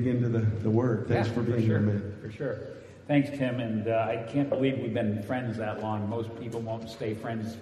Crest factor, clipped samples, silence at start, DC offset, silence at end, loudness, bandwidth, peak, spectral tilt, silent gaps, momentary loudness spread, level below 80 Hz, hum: 16 dB; under 0.1%; 0 s; under 0.1%; 0 s; -29 LUFS; 11 kHz; -12 dBFS; -8.5 dB/octave; none; 9 LU; -62 dBFS; none